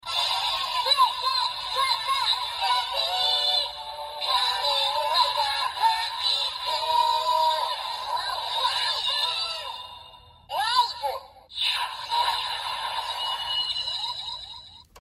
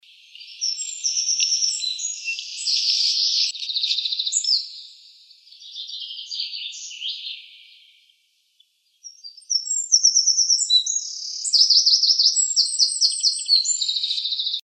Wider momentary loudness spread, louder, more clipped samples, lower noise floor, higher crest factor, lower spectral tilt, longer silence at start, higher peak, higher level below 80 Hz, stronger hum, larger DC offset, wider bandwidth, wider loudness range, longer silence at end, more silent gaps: second, 10 LU vs 17 LU; second, -24 LUFS vs -18 LUFS; neither; second, -49 dBFS vs -64 dBFS; about the same, 18 dB vs 20 dB; first, 1 dB/octave vs 14.5 dB/octave; second, 0.05 s vs 0.35 s; second, -8 dBFS vs -4 dBFS; first, -60 dBFS vs under -90 dBFS; neither; neither; first, 16 kHz vs 13 kHz; second, 4 LU vs 16 LU; about the same, 0 s vs 0.05 s; neither